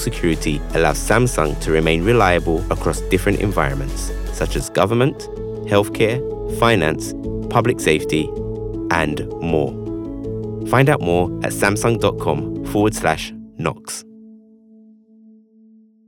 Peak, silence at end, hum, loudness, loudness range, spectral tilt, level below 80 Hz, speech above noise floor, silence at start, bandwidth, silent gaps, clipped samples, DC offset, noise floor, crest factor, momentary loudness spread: -2 dBFS; 1.7 s; none; -19 LUFS; 4 LU; -5.5 dB/octave; -30 dBFS; 32 dB; 0 s; 18 kHz; none; under 0.1%; under 0.1%; -50 dBFS; 18 dB; 11 LU